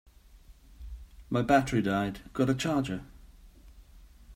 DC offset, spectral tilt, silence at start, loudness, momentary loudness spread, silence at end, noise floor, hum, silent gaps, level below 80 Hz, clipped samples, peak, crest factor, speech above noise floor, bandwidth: under 0.1%; -6 dB/octave; 0.35 s; -29 LUFS; 23 LU; 0 s; -55 dBFS; none; none; -50 dBFS; under 0.1%; -10 dBFS; 22 dB; 27 dB; 16 kHz